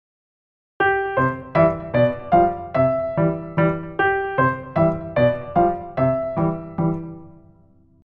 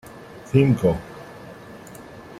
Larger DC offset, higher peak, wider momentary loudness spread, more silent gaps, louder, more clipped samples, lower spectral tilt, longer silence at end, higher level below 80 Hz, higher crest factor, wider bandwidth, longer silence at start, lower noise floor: neither; about the same, -4 dBFS vs -4 dBFS; second, 6 LU vs 23 LU; neither; about the same, -20 LUFS vs -20 LUFS; neither; first, -10 dB/octave vs -8 dB/octave; first, 0.7 s vs 0 s; about the same, -46 dBFS vs -48 dBFS; about the same, 18 dB vs 20 dB; second, 5 kHz vs 14 kHz; first, 0.8 s vs 0.15 s; first, -53 dBFS vs -41 dBFS